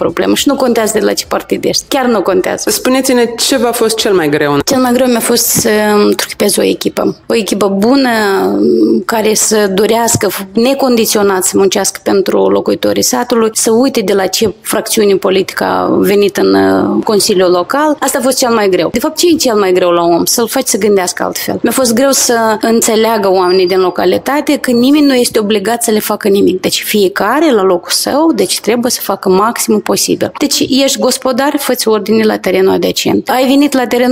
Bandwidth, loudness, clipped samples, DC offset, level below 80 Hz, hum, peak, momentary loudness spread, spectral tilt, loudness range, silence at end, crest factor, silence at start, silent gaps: 16.5 kHz; -10 LUFS; under 0.1%; under 0.1%; -46 dBFS; none; 0 dBFS; 4 LU; -3.5 dB/octave; 1 LU; 0 s; 10 dB; 0 s; none